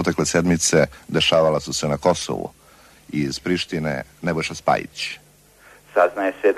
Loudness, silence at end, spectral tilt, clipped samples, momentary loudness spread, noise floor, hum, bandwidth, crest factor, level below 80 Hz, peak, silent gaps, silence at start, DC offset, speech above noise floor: -21 LUFS; 0 s; -4 dB/octave; under 0.1%; 12 LU; -51 dBFS; none; 13.5 kHz; 18 dB; -48 dBFS; -4 dBFS; none; 0 s; under 0.1%; 30 dB